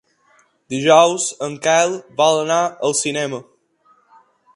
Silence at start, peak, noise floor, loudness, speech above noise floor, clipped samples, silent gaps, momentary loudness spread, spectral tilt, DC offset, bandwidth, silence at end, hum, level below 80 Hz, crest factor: 0.7 s; 0 dBFS; -57 dBFS; -17 LUFS; 41 dB; under 0.1%; none; 12 LU; -3 dB/octave; under 0.1%; 11.5 kHz; 1.15 s; none; -68 dBFS; 18 dB